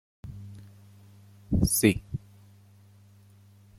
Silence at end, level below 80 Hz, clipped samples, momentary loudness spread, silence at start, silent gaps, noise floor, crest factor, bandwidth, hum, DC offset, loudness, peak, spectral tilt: 1.6 s; -44 dBFS; under 0.1%; 24 LU; 0.25 s; none; -55 dBFS; 26 dB; 16.5 kHz; 50 Hz at -50 dBFS; under 0.1%; -26 LUFS; -6 dBFS; -5 dB/octave